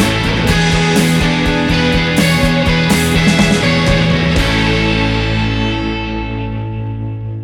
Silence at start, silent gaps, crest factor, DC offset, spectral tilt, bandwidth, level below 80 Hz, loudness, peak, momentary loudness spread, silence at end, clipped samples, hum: 0 s; none; 12 dB; under 0.1%; -5 dB/octave; 17 kHz; -24 dBFS; -13 LUFS; 0 dBFS; 10 LU; 0 s; under 0.1%; none